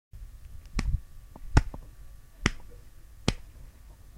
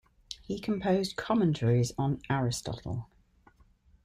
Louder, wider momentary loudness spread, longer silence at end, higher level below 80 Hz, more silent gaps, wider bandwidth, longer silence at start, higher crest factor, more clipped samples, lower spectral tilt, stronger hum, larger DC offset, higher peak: about the same, -32 LUFS vs -30 LUFS; first, 25 LU vs 12 LU; second, 0 s vs 1 s; first, -36 dBFS vs -56 dBFS; neither; about the same, 15.5 kHz vs 15 kHz; second, 0.15 s vs 0.3 s; first, 32 dB vs 18 dB; neither; about the same, -5 dB/octave vs -6 dB/octave; neither; neither; first, -2 dBFS vs -14 dBFS